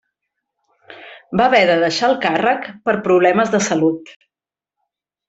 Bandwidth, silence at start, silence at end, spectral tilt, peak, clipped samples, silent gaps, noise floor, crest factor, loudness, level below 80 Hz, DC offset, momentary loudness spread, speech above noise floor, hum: 8.2 kHz; 0.9 s; 1.15 s; -4.5 dB/octave; -2 dBFS; under 0.1%; none; -89 dBFS; 16 dB; -16 LUFS; -58 dBFS; under 0.1%; 8 LU; 73 dB; none